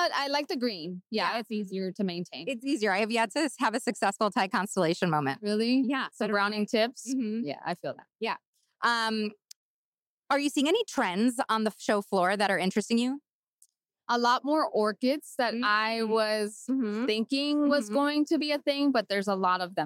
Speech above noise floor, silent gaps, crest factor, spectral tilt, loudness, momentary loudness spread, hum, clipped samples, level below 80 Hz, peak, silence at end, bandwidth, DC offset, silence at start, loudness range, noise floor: over 62 dB; 8.47-8.53 s, 9.56-9.93 s, 10.06-10.23 s, 13.33-13.57 s; 16 dB; -4.5 dB/octave; -28 LUFS; 8 LU; none; under 0.1%; -80 dBFS; -14 dBFS; 0 s; 16 kHz; under 0.1%; 0 s; 3 LU; under -90 dBFS